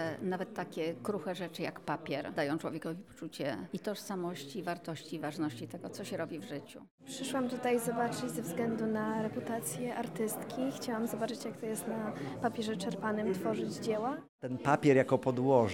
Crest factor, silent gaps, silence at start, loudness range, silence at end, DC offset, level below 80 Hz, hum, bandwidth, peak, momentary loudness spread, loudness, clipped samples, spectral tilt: 22 dB; 6.91-6.98 s, 14.29-14.39 s; 0 s; 7 LU; 0 s; under 0.1%; -74 dBFS; none; 18 kHz; -14 dBFS; 10 LU; -36 LUFS; under 0.1%; -5.5 dB/octave